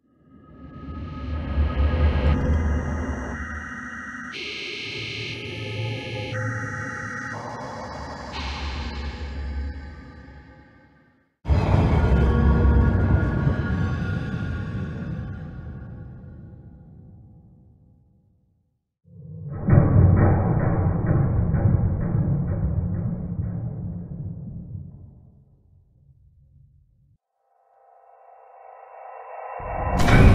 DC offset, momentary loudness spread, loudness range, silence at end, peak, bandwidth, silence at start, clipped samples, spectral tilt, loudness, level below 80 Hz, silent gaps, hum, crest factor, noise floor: under 0.1%; 20 LU; 17 LU; 0 s; -2 dBFS; 10.5 kHz; 0.5 s; under 0.1%; -7.5 dB/octave; -24 LUFS; -30 dBFS; none; none; 22 dB; -70 dBFS